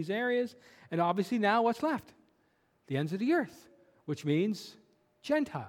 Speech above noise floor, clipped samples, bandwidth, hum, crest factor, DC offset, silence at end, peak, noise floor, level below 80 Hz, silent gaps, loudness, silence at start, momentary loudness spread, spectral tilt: 41 dB; under 0.1%; 17 kHz; none; 20 dB; under 0.1%; 0 s; -14 dBFS; -72 dBFS; -76 dBFS; none; -32 LUFS; 0 s; 13 LU; -6.5 dB/octave